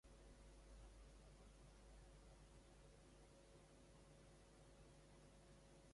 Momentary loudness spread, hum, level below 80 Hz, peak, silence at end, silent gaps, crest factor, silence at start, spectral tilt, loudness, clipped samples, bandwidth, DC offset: 2 LU; none; -68 dBFS; -54 dBFS; 0 s; none; 12 dB; 0.05 s; -4.5 dB/octave; -68 LUFS; under 0.1%; 11.5 kHz; under 0.1%